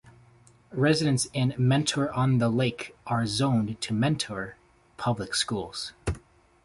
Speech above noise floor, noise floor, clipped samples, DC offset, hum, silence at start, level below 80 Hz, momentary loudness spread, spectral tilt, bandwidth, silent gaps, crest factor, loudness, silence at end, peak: 31 dB; -57 dBFS; under 0.1%; under 0.1%; none; 0.05 s; -50 dBFS; 11 LU; -5 dB/octave; 11.5 kHz; none; 20 dB; -27 LUFS; 0.45 s; -8 dBFS